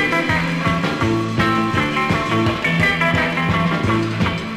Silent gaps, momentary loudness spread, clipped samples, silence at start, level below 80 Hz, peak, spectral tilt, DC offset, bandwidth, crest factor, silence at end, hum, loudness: none; 3 LU; under 0.1%; 0 s; -40 dBFS; -6 dBFS; -6 dB/octave; 0.2%; 15.5 kHz; 12 dB; 0 s; none; -18 LUFS